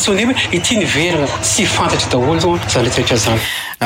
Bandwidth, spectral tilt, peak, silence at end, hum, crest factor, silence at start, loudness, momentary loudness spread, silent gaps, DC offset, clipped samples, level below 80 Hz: 17 kHz; -3.5 dB/octave; -4 dBFS; 0 s; none; 10 dB; 0 s; -14 LUFS; 2 LU; none; under 0.1%; under 0.1%; -38 dBFS